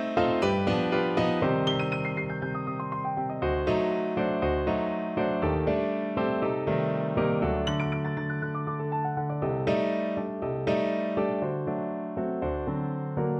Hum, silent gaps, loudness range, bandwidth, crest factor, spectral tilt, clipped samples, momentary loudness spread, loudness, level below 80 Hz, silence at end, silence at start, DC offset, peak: none; none; 2 LU; 8.2 kHz; 18 dB; -7.5 dB/octave; under 0.1%; 6 LU; -28 LUFS; -44 dBFS; 0 s; 0 s; under 0.1%; -10 dBFS